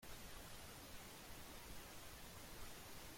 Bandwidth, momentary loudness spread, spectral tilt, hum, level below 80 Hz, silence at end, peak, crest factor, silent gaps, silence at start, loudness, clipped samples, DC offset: 16.5 kHz; 1 LU; -3 dB/octave; none; -64 dBFS; 0 s; -42 dBFS; 12 dB; none; 0 s; -56 LUFS; under 0.1%; under 0.1%